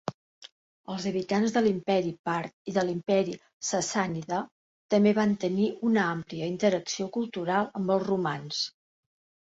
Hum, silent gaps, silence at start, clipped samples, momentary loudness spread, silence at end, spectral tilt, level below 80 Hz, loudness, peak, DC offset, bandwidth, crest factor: none; 0.14-0.42 s, 0.52-0.84 s, 2.19-2.24 s, 2.53-2.65 s, 3.53-3.60 s, 4.51-4.89 s; 0.05 s; under 0.1%; 9 LU; 0.75 s; -5 dB/octave; -68 dBFS; -28 LUFS; -10 dBFS; under 0.1%; 8 kHz; 18 dB